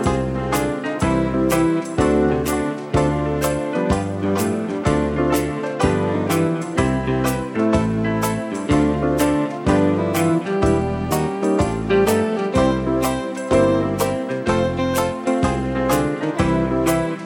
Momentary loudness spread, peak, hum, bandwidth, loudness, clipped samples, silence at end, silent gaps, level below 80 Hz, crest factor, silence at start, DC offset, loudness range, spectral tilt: 4 LU; -2 dBFS; none; 17 kHz; -20 LUFS; under 0.1%; 0 s; none; -34 dBFS; 18 dB; 0 s; under 0.1%; 1 LU; -6 dB/octave